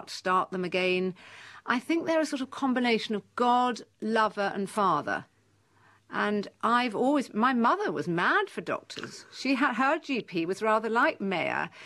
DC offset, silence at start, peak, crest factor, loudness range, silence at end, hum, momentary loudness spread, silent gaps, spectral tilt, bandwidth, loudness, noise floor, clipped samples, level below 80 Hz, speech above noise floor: under 0.1%; 0 s; -12 dBFS; 16 dB; 2 LU; 0 s; none; 10 LU; none; -5 dB/octave; 13 kHz; -28 LUFS; -65 dBFS; under 0.1%; -76 dBFS; 37 dB